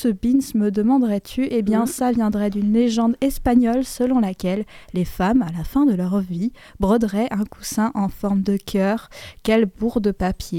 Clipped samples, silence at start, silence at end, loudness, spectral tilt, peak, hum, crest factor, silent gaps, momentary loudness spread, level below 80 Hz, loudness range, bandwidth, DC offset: under 0.1%; 0 s; 0 s; -20 LUFS; -6.5 dB/octave; -6 dBFS; none; 14 dB; none; 8 LU; -40 dBFS; 2 LU; 16.5 kHz; under 0.1%